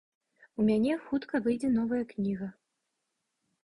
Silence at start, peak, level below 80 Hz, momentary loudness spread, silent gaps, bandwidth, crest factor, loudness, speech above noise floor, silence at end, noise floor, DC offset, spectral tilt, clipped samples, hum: 0.6 s; -16 dBFS; -64 dBFS; 10 LU; none; 11 kHz; 16 dB; -30 LUFS; 53 dB; 1.1 s; -83 dBFS; under 0.1%; -7.5 dB/octave; under 0.1%; none